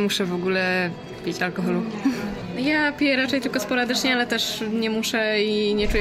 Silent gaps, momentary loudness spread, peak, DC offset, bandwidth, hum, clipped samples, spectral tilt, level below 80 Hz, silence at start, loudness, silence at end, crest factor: none; 6 LU; -8 dBFS; under 0.1%; 16 kHz; none; under 0.1%; -4 dB/octave; -42 dBFS; 0 s; -23 LUFS; 0 s; 14 dB